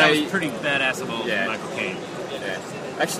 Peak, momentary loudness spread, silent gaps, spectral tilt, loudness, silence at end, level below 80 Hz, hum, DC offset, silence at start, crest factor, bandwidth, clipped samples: -2 dBFS; 10 LU; none; -3.5 dB/octave; -24 LUFS; 0 s; -64 dBFS; none; under 0.1%; 0 s; 22 dB; 15.5 kHz; under 0.1%